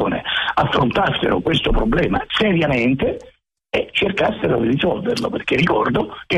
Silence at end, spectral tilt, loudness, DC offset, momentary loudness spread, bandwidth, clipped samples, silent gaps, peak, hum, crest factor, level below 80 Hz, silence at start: 0 s; -6.5 dB/octave; -18 LUFS; under 0.1%; 5 LU; 12.5 kHz; under 0.1%; none; -6 dBFS; none; 12 dB; -32 dBFS; 0 s